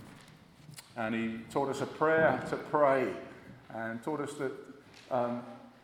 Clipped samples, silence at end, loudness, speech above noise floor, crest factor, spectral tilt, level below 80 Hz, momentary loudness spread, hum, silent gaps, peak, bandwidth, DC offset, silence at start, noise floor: under 0.1%; 0.15 s; -32 LUFS; 24 dB; 20 dB; -6 dB/octave; -70 dBFS; 23 LU; none; none; -14 dBFS; 16 kHz; under 0.1%; 0 s; -56 dBFS